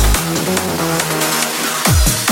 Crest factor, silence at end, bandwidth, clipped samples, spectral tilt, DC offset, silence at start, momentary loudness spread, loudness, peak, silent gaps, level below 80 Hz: 14 dB; 0 s; 17 kHz; under 0.1%; -3 dB/octave; under 0.1%; 0 s; 4 LU; -15 LUFS; -2 dBFS; none; -22 dBFS